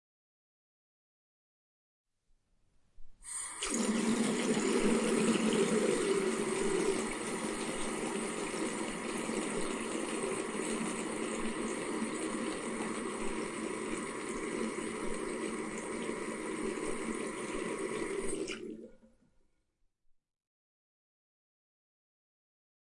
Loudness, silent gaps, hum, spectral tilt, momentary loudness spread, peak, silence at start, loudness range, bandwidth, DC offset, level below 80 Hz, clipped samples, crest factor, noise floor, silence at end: -35 LUFS; none; none; -3.5 dB/octave; 8 LU; -18 dBFS; 3 s; 10 LU; 11.5 kHz; under 0.1%; -58 dBFS; under 0.1%; 20 dB; -76 dBFS; 3.9 s